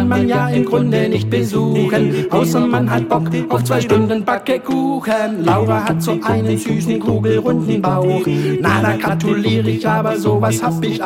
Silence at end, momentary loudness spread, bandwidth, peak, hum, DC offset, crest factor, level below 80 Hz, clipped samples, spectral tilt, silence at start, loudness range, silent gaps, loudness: 0 s; 3 LU; 17 kHz; -2 dBFS; none; under 0.1%; 14 dB; -48 dBFS; under 0.1%; -6.5 dB/octave; 0 s; 1 LU; none; -16 LUFS